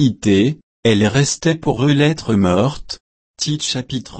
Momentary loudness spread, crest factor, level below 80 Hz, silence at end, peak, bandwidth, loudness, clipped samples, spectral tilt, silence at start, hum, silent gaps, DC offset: 9 LU; 14 dB; -44 dBFS; 0 s; -2 dBFS; 8.8 kHz; -17 LUFS; under 0.1%; -5 dB/octave; 0 s; none; 0.63-0.83 s, 3.00-3.34 s; under 0.1%